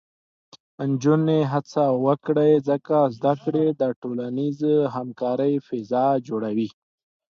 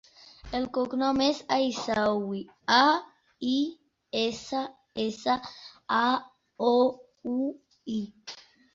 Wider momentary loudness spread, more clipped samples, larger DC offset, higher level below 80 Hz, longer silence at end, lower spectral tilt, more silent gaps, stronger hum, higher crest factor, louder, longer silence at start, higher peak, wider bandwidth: second, 8 LU vs 14 LU; neither; neither; second, -70 dBFS vs -62 dBFS; first, 0.6 s vs 0.35 s; first, -8.5 dB/octave vs -4 dB/octave; first, 3.96-4.02 s vs none; neither; second, 16 dB vs 22 dB; first, -23 LUFS vs -28 LUFS; first, 0.8 s vs 0.45 s; about the same, -6 dBFS vs -6 dBFS; second, 7 kHz vs 7.8 kHz